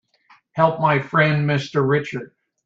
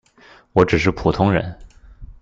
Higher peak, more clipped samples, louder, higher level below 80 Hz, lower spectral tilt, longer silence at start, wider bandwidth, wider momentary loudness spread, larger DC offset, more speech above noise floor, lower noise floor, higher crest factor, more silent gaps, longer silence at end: about the same, -2 dBFS vs -2 dBFS; neither; about the same, -19 LUFS vs -18 LUFS; second, -60 dBFS vs -38 dBFS; about the same, -7 dB/octave vs -7 dB/octave; about the same, 0.55 s vs 0.55 s; about the same, 7.4 kHz vs 7.6 kHz; first, 14 LU vs 6 LU; neither; first, 37 dB vs 32 dB; first, -56 dBFS vs -49 dBFS; about the same, 18 dB vs 18 dB; neither; first, 0.4 s vs 0.1 s